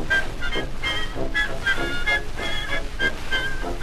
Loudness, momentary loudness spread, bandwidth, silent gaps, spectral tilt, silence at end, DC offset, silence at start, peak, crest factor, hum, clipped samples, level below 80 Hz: -25 LUFS; 5 LU; 13 kHz; none; -3.5 dB/octave; 0 s; under 0.1%; 0 s; -10 dBFS; 14 dB; none; under 0.1%; -30 dBFS